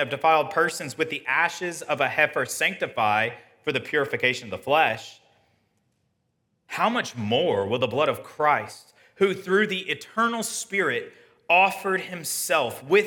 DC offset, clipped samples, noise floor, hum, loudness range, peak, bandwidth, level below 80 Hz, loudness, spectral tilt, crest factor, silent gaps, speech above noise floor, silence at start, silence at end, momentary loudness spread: under 0.1%; under 0.1%; -73 dBFS; none; 3 LU; -6 dBFS; 18 kHz; -74 dBFS; -24 LUFS; -3.5 dB/octave; 20 dB; none; 49 dB; 0 s; 0 s; 8 LU